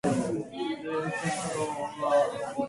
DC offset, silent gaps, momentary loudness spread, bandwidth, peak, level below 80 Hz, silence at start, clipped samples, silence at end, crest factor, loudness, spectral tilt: under 0.1%; none; 7 LU; 11.5 kHz; -14 dBFS; -62 dBFS; 0.05 s; under 0.1%; 0 s; 16 dB; -30 LUFS; -5 dB/octave